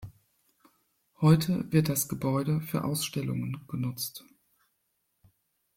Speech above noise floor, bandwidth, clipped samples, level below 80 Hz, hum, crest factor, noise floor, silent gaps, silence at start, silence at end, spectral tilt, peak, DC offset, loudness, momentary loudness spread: 49 dB; 16.5 kHz; under 0.1%; -60 dBFS; none; 20 dB; -77 dBFS; none; 0 s; 1.55 s; -6 dB/octave; -10 dBFS; under 0.1%; -29 LUFS; 12 LU